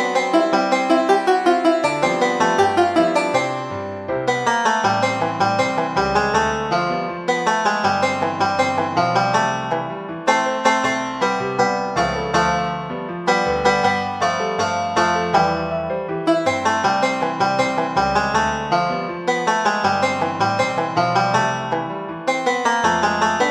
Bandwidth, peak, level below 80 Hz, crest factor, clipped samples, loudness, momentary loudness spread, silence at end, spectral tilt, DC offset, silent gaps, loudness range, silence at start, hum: 13 kHz; 0 dBFS; -48 dBFS; 18 dB; under 0.1%; -19 LUFS; 6 LU; 0 s; -4.5 dB/octave; under 0.1%; none; 2 LU; 0 s; none